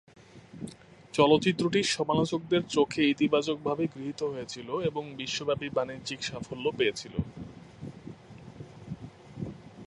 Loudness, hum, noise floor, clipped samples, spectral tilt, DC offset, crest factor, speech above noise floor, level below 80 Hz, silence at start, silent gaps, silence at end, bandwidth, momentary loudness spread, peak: -29 LUFS; none; -49 dBFS; under 0.1%; -5 dB/octave; under 0.1%; 22 dB; 20 dB; -58 dBFS; 0.35 s; none; 0.05 s; 11.5 kHz; 21 LU; -8 dBFS